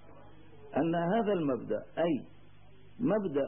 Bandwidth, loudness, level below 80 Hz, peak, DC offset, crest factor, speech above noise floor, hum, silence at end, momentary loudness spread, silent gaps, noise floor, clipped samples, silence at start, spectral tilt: 3.6 kHz; -32 LUFS; -66 dBFS; -18 dBFS; 0.3%; 14 dB; 28 dB; 50 Hz at -60 dBFS; 0 s; 7 LU; none; -58 dBFS; under 0.1%; 0.15 s; -11 dB/octave